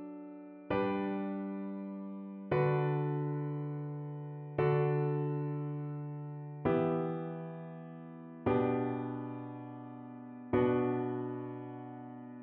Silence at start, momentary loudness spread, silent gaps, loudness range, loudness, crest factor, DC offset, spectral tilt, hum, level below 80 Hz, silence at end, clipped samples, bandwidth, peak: 0 s; 16 LU; none; 3 LU; -36 LUFS; 18 dB; under 0.1%; -8 dB/octave; none; -66 dBFS; 0 s; under 0.1%; 4.3 kHz; -18 dBFS